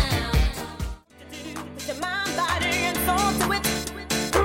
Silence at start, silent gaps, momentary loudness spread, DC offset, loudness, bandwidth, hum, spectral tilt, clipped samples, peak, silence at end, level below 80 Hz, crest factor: 0 s; none; 14 LU; under 0.1%; -25 LUFS; 16.5 kHz; none; -3.5 dB/octave; under 0.1%; -6 dBFS; 0 s; -32 dBFS; 18 dB